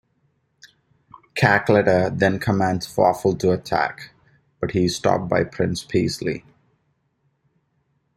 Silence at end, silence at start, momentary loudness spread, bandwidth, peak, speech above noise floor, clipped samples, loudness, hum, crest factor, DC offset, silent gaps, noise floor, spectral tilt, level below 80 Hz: 1.75 s; 1.35 s; 11 LU; 15.5 kHz; -2 dBFS; 49 dB; under 0.1%; -21 LUFS; none; 20 dB; under 0.1%; none; -69 dBFS; -6 dB/octave; -52 dBFS